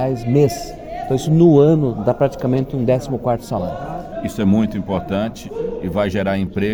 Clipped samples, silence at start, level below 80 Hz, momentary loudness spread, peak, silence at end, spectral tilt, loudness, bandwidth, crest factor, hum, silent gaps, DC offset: under 0.1%; 0 s; -40 dBFS; 14 LU; -2 dBFS; 0 s; -7.5 dB/octave; -18 LUFS; over 20 kHz; 16 dB; none; none; under 0.1%